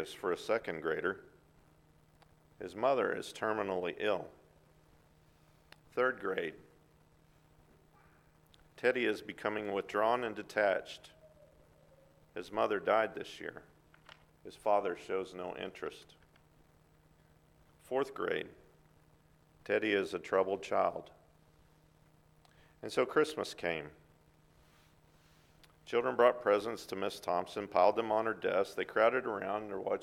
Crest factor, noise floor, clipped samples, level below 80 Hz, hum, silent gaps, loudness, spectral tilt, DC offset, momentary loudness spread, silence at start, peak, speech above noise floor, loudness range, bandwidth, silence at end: 24 dB; -66 dBFS; under 0.1%; -72 dBFS; none; none; -34 LUFS; -4.5 dB/octave; under 0.1%; 16 LU; 0 s; -12 dBFS; 32 dB; 8 LU; 15.5 kHz; 0 s